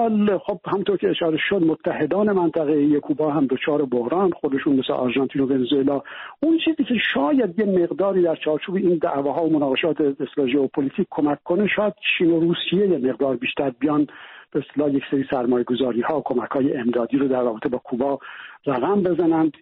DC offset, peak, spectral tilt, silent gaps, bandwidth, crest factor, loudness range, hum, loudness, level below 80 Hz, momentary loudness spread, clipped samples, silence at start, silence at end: under 0.1%; -8 dBFS; -4.5 dB/octave; none; 4.1 kHz; 12 dB; 2 LU; none; -21 LUFS; -60 dBFS; 5 LU; under 0.1%; 0 s; 0.1 s